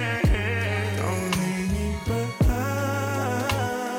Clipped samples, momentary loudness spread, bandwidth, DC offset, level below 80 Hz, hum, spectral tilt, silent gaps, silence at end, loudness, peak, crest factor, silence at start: under 0.1%; 4 LU; 17 kHz; under 0.1%; -32 dBFS; none; -5.5 dB/octave; none; 0 s; -25 LUFS; -10 dBFS; 14 dB; 0 s